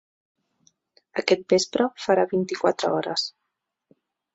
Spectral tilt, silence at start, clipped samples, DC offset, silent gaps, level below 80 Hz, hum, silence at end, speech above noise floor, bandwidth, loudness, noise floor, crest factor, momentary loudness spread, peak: -4 dB/octave; 1.15 s; under 0.1%; under 0.1%; none; -70 dBFS; none; 1.05 s; 58 dB; 8 kHz; -24 LUFS; -81 dBFS; 22 dB; 7 LU; -4 dBFS